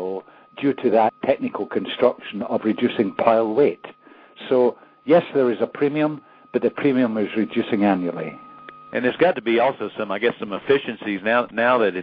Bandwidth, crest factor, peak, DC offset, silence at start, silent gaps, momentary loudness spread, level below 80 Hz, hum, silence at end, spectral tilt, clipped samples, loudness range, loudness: 5.2 kHz; 18 dB; -2 dBFS; under 0.1%; 0 s; none; 12 LU; -66 dBFS; none; 0 s; -9 dB/octave; under 0.1%; 2 LU; -21 LUFS